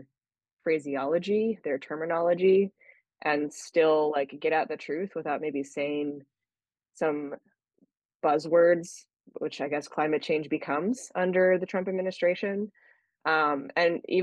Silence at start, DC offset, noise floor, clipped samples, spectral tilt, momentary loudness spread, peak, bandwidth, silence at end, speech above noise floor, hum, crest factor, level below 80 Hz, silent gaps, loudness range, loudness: 0.65 s; under 0.1%; under -90 dBFS; under 0.1%; -5.5 dB/octave; 11 LU; -12 dBFS; 10 kHz; 0 s; over 63 dB; none; 16 dB; -80 dBFS; 8.05-8.09 s, 8.15-8.20 s; 5 LU; -28 LUFS